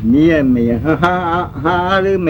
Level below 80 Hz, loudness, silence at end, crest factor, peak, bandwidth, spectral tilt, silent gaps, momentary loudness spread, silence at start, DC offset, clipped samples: -34 dBFS; -14 LUFS; 0 s; 14 dB; 0 dBFS; 18.5 kHz; -8 dB/octave; none; 6 LU; 0 s; under 0.1%; under 0.1%